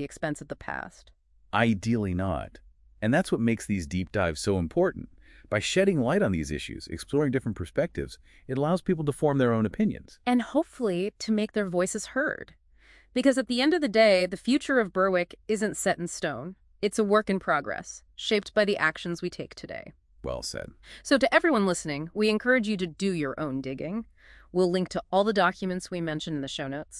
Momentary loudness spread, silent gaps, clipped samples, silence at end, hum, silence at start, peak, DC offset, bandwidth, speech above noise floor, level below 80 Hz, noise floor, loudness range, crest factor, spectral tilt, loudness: 13 LU; none; under 0.1%; 0 s; none; 0 s; -6 dBFS; under 0.1%; 12 kHz; 30 dB; -54 dBFS; -57 dBFS; 4 LU; 20 dB; -5 dB/octave; -27 LUFS